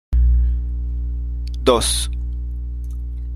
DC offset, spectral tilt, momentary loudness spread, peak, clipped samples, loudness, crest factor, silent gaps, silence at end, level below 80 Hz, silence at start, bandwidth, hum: under 0.1%; -4.5 dB/octave; 12 LU; -2 dBFS; under 0.1%; -22 LUFS; 18 dB; none; 0 s; -20 dBFS; 0.1 s; 13.5 kHz; 60 Hz at -25 dBFS